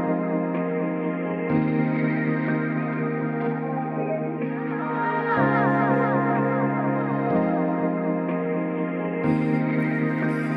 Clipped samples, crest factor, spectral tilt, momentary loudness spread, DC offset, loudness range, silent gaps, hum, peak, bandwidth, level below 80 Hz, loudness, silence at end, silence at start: under 0.1%; 16 dB; -10 dB/octave; 6 LU; under 0.1%; 3 LU; none; none; -8 dBFS; 5.2 kHz; -62 dBFS; -24 LUFS; 0 s; 0 s